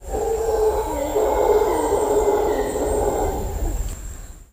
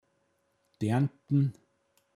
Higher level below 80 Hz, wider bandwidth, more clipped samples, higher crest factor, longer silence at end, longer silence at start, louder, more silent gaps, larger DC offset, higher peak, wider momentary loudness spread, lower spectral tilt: first, -30 dBFS vs -72 dBFS; first, 15.5 kHz vs 11 kHz; neither; about the same, 14 dB vs 16 dB; second, 0.1 s vs 0.65 s; second, 0 s vs 0.8 s; first, -21 LUFS vs -30 LUFS; neither; neither; first, -6 dBFS vs -16 dBFS; first, 12 LU vs 5 LU; second, -5.5 dB/octave vs -8.5 dB/octave